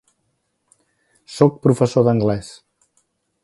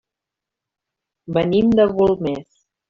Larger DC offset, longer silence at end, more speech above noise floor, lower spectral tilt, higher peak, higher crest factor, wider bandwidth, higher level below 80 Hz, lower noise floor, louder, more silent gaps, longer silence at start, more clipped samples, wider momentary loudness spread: neither; first, 0.95 s vs 0.5 s; second, 54 dB vs 68 dB; about the same, -7.5 dB/octave vs -6.5 dB/octave; first, 0 dBFS vs -4 dBFS; about the same, 20 dB vs 16 dB; first, 11.5 kHz vs 7 kHz; about the same, -52 dBFS vs -50 dBFS; second, -70 dBFS vs -85 dBFS; about the same, -17 LUFS vs -18 LUFS; neither; about the same, 1.3 s vs 1.3 s; neither; first, 17 LU vs 10 LU